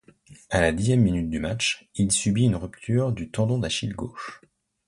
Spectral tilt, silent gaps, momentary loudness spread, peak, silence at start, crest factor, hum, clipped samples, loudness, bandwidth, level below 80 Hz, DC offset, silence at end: -5 dB/octave; none; 11 LU; -6 dBFS; 0.3 s; 18 dB; none; under 0.1%; -24 LUFS; 11.5 kHz; -44 dBFS; under 0.1%; 0.5 s